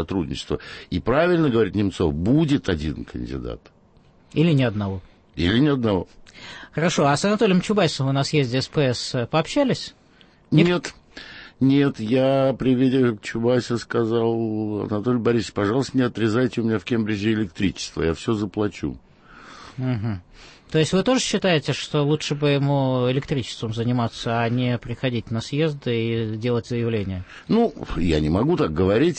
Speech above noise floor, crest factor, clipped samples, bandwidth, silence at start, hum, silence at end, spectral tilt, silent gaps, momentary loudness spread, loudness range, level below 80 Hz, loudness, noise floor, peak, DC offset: 33 dB; 18 dB; under 0.1%; 8.8 kHz; 0 s; none; 0 s; -6 dB/octave; none; 11 LU; 4 LU; -44 dBFS; -22 LUFS; -54 dBFS; -4 dBFS; under 0.1%